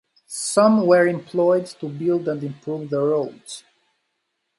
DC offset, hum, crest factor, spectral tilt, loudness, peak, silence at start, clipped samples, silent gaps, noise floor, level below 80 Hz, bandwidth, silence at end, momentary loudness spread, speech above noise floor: under 0.1%; none; 18 dB; -5.5 dB/octave; -20 LUFS; -4 dBFS; 0.3 s; under 0.1%; none; -75 dBFS; -72 dBFS; 11.5 kHz; 1 s; 17 LU; 55 dB